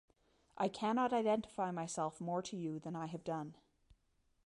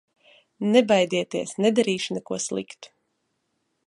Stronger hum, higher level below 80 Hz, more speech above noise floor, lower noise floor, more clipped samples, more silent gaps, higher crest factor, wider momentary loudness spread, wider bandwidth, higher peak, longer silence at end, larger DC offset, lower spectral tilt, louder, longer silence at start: neither; about the same, -76 dBFS vs -72 dBFS; second, 39 dB vs 52 dB; about the same, -77 dBFS vs -75 dBFS; neither; neither; second, 16 dB vs 22 dB; about the same, 10 LU vs 12 LU; about the same, 11.5 kHz vs 11.5 kHz; second, -24 dBFS vs -4 dBFS; about the same, 0.9 s vs 1 s; neither; about the same, -5.5 dB/octave vs -4.5 dB/octave; second, -39 LUFS vs -23 LUFS; about the same, 0.55 s vs 0.6 s